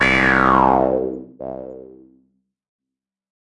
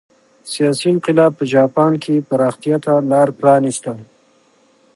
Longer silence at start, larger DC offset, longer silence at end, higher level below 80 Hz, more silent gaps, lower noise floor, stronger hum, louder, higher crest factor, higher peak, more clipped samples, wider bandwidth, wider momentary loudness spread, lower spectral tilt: second, 0 s vs 0.45 s; neither; first, 1.6 s vs 0.9 s; first, -40 dBFS vs -66 dBFS; neither; first, -86 dBFS vs -54 dBFS; neither; about the same, -15 LUFS vs -15 LUFS; about the same, 18 dB vs 16 dB; about the same, -2 dBFS vs 0 dBFS; neither; about the same, 11 kHz vs 11.5 kHz; first, 19 LU vs 9 LU; about the same, -6 dB/octave vs -6 dB/octave